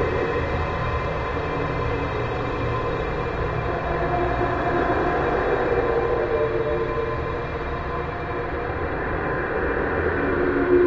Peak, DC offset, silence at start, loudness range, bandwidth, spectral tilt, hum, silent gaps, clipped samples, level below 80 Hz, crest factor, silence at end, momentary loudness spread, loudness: -8 dBFS; under 0.1%; 0 s; 3 LU; 7.4 kHz; -8 dB/octave; none; none; under 0.1%; -34 dBFS; 16 dB; 0 s; 6 LU; -24 LUFS